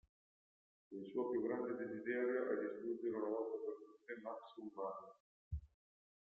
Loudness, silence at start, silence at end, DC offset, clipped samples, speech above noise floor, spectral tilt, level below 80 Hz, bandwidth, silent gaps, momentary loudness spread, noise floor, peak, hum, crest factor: -44 LUFS; 0.9 s; 0.6 s; under 0.1%; under 0.1%; over 47 dB; -7 dB/octave; -64 dBFS; 4.1 kHz; 5.20-5.51 s; 13 LU; under -90 dBFS; -28 dBFS; none; 18 dB